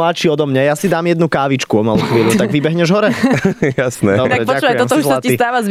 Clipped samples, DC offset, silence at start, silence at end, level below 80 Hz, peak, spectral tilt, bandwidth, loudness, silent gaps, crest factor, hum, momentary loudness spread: under 0.1%; under 0.1%; 0 s; 0 s; -48 dBFS; -2 dBFS; -5.5 dB/octave; 16 kHz; -14 LUFS; none; 12 dB; none; 2 LU